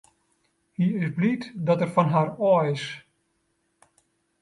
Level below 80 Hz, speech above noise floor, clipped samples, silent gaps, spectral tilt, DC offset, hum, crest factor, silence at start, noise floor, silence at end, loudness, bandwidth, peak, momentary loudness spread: -68 dBFS; 49 dB; under 0.1%; none; -8 dB/octave; under 0.1%; none; 20 dB; 0.8 s; -72 dBFS; 1.4 s; -24 LUFS; 11.5 kHz; -6 dBFS; 12 LU